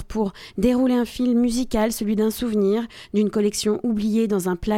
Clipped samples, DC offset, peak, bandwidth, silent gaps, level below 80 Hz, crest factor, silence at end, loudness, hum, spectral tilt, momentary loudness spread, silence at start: under 0.1%; under 0.1%; -8 dBFS; 16.5 kHz; none; -42 dBFS; 14 dB; 0 s; -22 LUFS; none; -5.5 dB/octave; 5 LU; 0 s